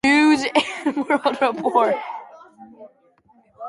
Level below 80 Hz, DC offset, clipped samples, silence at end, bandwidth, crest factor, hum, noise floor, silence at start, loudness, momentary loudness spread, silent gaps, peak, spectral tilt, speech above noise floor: -62 dBFS; under 0.1%; under 0.1%; 0 s; 11.5 kHz; 20 dB; none; -57 dBFS; 0.05 s; -19 LUFS; 11 LU; none; -2 dBFS; -3.5 dB/octave; 37 dB